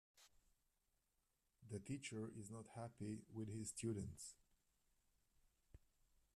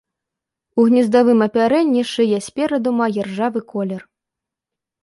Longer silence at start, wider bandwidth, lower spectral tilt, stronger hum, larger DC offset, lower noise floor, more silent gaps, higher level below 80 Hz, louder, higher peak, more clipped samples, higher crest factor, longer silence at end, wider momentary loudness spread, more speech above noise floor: second, 0.15 s vs 0.75 s; first, 13.5 kHz vs 11.5 kHz; about the same, -5.5 dB/octave vs -6 dB/octave; neither; neither; about the same, -87 dBFS vs -85 dBFS; neither; second, -76 dBFS vs -62 dBFS; second, -52 LUFS vs -17 LUFS; second, -36 dBFS vs -2 dBFS; neither; about the same, 20 dB vs 16 dB; second, 0.6 s vs 1.05 s; second, 8 LU vs 11 LU; second, 36 dB vs 69 dB